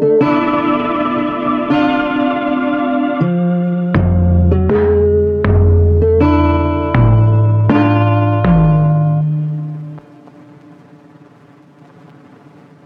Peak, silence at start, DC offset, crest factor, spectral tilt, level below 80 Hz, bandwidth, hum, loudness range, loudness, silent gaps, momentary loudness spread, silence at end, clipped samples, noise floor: 0 dBFS; 0 s; under 0.1%; 12 dB; -10.5 dB/octave; -26 dBFS; 4.9 kHz; none; 7 LU; -13 LUFS; none; 5 LU; 2.85 s; under 0.1%; -43 dBFS